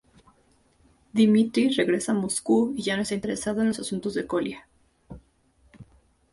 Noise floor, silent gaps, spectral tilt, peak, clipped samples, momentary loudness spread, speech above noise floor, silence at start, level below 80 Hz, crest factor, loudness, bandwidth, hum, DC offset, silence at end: -63 dBFS; none; -4.5 dB/octave; -10 dBFS; under 0.1%; 9 LU; 39 dB; 1.15 s; -58 dBFS; 18 dB; -25 LUFS; 11.5 kHz; none; under 0.1%; 0.5 s